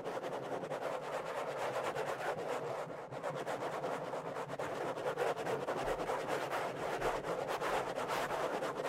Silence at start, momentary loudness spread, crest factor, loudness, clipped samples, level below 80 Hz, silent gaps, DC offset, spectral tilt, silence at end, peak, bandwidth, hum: 0 s; 5 LU; 16 dB; -39 LUFS; under 0.1%; -64 dBFS; none; under 0.1%; -4.5 dB/octave; 0 s; -24 dBFS; 16 kHz; none